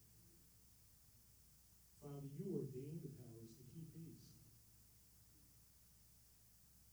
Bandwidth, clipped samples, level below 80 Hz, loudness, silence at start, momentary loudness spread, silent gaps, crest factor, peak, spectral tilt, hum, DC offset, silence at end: over 20 kHz; under 0.1%; -76 dBFS; -56 LUFS; 0 s; 18 LU; none; 24 dB; -34 dBFS; -7 dB/octave; none; under 0.1%; 0 s